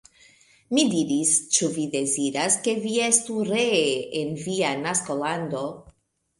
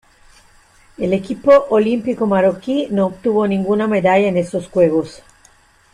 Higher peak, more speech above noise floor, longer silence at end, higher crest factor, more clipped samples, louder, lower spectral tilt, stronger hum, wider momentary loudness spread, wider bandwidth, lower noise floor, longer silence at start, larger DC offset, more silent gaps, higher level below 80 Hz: second, -6 dBFS vs -2 dBFS; about the same, 38 dB vs 36 dB; second, 0.5 s vs 0.75 s; about the same, 20 dB vs 16 dB; neither; second, -23 LUFS vs -16 LUFS; second, -3 dB/octave vs -7.5 dB/octave; neither; about the same, 8 LU vs 8 LU; about the same, 11.5 kHz vs 10.5 kHz; first, -62 dBFS vs -51 dBFS; second, 0.7 s vs 1 s; neither; neither; second, -64 dBFS vs -52 dBFS